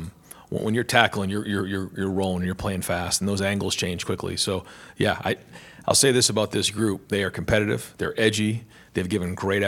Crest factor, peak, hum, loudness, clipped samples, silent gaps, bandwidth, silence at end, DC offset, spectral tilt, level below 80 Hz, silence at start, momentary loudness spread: 24 dB; 0 dBFS; none; -24 LUFS; under 0.1%; none; 18 kHz; 0 s; under 0.1%; -3.5 dB/octave; -50 dBFS; 0 s; 10 LU